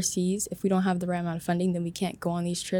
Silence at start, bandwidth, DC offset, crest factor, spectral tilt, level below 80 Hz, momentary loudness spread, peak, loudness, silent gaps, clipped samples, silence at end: 0 s; 18 kHz; under 0.1%; 14 dB; -5 dB/octave; -60 dBFS; 4 LU; -14 dBFS; -28 LUFS; none; under 0.1%; 0 s